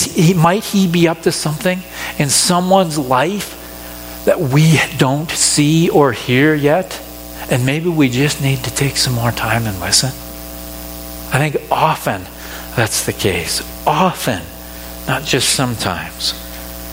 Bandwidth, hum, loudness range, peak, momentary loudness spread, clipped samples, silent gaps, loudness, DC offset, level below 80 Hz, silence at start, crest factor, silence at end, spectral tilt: 17 kHz; 60 Hz at -35 dBFS; 5 LU; 0 dBFS; 16 LU; under 0.1%; none; -15 LUFS; under 0.1%; -38 dBFS; 0 s; 16 dB; 0 s; -4 dB/octave